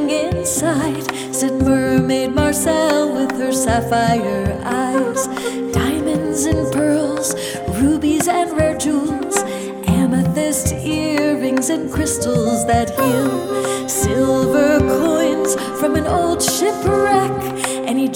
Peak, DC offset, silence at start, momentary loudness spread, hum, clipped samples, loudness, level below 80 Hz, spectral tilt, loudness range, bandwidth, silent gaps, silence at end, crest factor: -2 dBFS; under 0.1%; 0 s; 5 LU; none; under 0.1%; -17 LUFS; -36 dBFS; -4.5 dB/octave; 2 LU; 20 kHz; none; 0 s; 14 dB